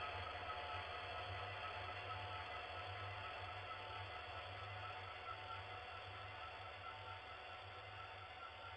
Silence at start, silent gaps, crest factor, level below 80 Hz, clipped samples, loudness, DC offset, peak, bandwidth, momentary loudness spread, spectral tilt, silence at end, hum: 0 s; none; 18 dB; -70 dBFS; under 0.1%; -50 LUFS; under 0.1%; -34 dBFS; 9.6 kHz; 5 LU; -4.5 dB/octave; 0 s; none